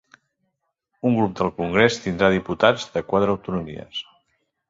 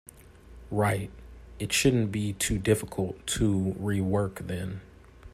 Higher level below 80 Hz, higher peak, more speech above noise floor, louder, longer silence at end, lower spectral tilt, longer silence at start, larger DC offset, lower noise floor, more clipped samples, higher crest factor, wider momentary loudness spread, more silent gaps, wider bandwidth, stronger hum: about the same, -50 dBFS vs -46 dBFS; first, -2 dBFS vs -10 dBFS; first, 54 dB vs 23 dB; first, -21 LUFS vs -28 LUFS; first, 0.65 s vs 0.05 s; about the same, -5.5 dB/octave vs -5 dB/octave; first, 1.05 s vs 0.15 s; neither; first, -75 dBFS vs -50 dBFS; neither; about the same, 22 dB vs 20 dB; about the same, 12 LU vs 11 LU; neither; second, 7.8 kHz vs 15 kHz; neither